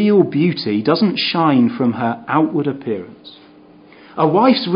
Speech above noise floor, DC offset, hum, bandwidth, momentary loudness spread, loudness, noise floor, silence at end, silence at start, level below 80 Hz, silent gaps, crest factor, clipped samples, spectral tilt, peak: 29 dB; under 0.1%; none; 5.4 kHz; 11 LU; -16 LUFS; -44 dBFS; 0 s; 0 s; -62 dBFS; none; 16 dB; under 0.1%; -11 dB/octave; 0 dBFS